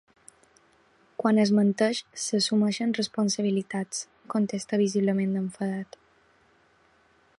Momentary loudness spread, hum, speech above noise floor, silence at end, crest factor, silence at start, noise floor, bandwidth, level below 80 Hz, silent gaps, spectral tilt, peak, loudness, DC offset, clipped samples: 10 LU; none; 37 dB; 1.55 s; 18 dB; 1.2 s; -63 dBFS; 11.5 kHz; -72 dBFS; none; -5 dB/octave; -10 dBFS; -26 LUFS; under 0.1%; under 0.1%